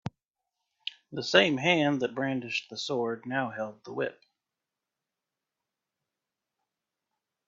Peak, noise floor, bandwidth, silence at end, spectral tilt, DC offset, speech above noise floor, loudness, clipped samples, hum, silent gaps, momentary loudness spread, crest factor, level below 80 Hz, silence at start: -4 dBFS; -88 dBFS; 7.8 kHz; 3.35 s; -4.5 dB/octave; under 0.1%; 60 dB; -29 LUFS; under 0.1%; none; 0.25-0.29 s; 16 LU; 28 dB; -74 dBFS; 0.05 s